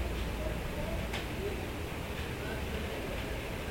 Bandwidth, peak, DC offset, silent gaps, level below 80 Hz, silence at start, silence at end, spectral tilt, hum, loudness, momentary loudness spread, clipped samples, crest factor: 17 kHz; -22 dBFS; under 0.1%; none; -42 dBFS; 0 s; 0 s; -5 dB/octave; none; -37 LUFS; 2 LU; under 0.1%; 14 dB